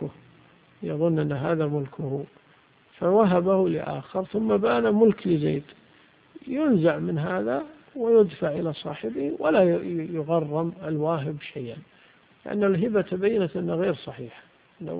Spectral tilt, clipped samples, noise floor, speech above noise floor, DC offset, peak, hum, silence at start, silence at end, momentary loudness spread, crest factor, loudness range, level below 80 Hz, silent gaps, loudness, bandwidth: -12 dB/octave; under 0.1%; -58 dBFS; 34 dB; under 0.1%; -6 dBFS; none; 0 s; 0 s; 16 LU; 18 dB; 4 LU; -62 dBFS; none; -25 LUFS; 4.9 kHz